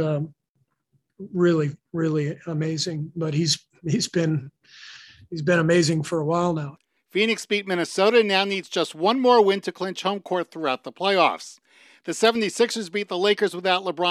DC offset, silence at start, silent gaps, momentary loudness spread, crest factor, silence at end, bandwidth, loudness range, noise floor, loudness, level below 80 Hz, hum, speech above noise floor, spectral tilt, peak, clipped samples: under 0.1%; 0 s; 0.49-0.55 s; 12 LU; 20 dB; 0 s; 14 kHz; 5 LU; -72 dBFS; -23 LUFS; -66 dBFS; none; 49 dB; -5 dB/octave; -4 dBFS; under 0.1%